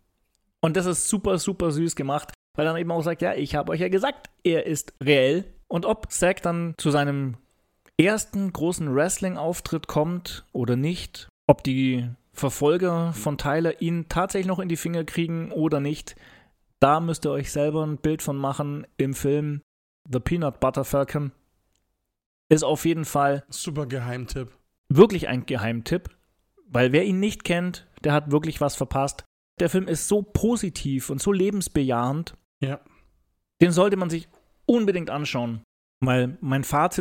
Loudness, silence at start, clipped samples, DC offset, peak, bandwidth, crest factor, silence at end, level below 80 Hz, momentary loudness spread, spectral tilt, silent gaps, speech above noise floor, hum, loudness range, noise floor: -24 LUFS; 0.65 s; under 0.1%; under 0.1%; 0 dBFS; 17 kHz; 24 dB; 0 s; -48 dBFS; 10 LU; -5.5 dB/octave; 2.35-2.54 s, 11.29-11.48 s, 19.63-20.05 s, 22.26-22.50 s, 24.78-24.84 s, 29.26-29.57 s, 32.45-32.61 s, 35.64-36.01 s; 52 dB; none; 3 LU; -76 dBFS